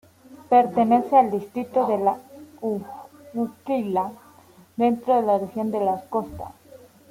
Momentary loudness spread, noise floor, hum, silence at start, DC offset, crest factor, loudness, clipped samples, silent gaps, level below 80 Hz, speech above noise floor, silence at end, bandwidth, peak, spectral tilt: 16 LU; -51 dBFS; none; 0.3 s; under 0.1%; 18 dB; -23 LUFS; under 0.1%; none; -60 dBFS; 30 dB; 0.6 s; 16 kHz; -4 dBFS; -7.5 dB/octave